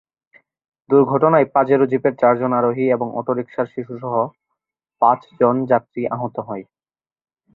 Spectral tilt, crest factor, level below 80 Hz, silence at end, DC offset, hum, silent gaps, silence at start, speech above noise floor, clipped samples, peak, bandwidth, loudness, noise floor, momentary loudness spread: -11 dB/octave; 18 dB; -64 dBFS; 0.9 s; under 0.1%; none; none; 0.9 s; over 72 dB; under 0.1%; -2 dBFS; 4.1 kHz; -18 LUFS; under -90 dBFS; 11 LU